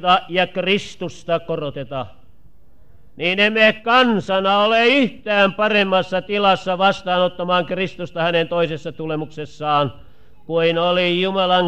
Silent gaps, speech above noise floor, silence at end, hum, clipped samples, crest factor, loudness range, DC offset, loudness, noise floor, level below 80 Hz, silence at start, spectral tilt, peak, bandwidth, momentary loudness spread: none; 34 dB; 0 s; none; under 0.1%; 16 dB; 6 LU; 1%; -18 LUFS; -53 dBFS; -54 dBFS; 0 s; -5.5 dB/octave; -2 dBFS; 9.4 kHz; 12 LU